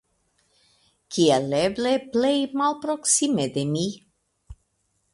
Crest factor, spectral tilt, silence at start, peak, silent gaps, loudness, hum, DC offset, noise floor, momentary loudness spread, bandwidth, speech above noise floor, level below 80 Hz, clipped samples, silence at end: 18 dB; -4 dB/octave; 1.1 s; -6 dBFS; none; -23 LUFS; none; under 0.1%; -72 dBFS; 8 LU; 11.5 kHz; 49 dB; -56 dBFS; under 0.1%; 0.6 s